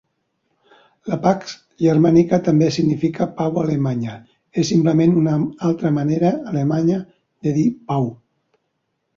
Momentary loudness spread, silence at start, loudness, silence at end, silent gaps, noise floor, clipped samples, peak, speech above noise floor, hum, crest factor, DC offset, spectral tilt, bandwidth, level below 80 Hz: 11 LU; 1.05 s; -19 LUFS; 1 s; none; -72 dBFS; under 0.1%; -2 dBFS; 55 dB; none; 18 dB; under 0.1%; -7.5 dB/octave; 7.4 kHz; -56 dBFS